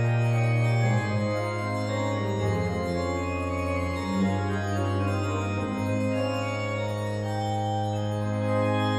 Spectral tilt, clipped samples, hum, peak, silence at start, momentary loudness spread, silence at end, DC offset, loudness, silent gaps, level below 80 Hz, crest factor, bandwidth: -7 dB/octave; under 0.1%; none; -14 dBFS; 0 s; 5 LU; 0 s; under 0.1%; -27 LUFS; none; -50 dBFS; 12 dB; 12 kHz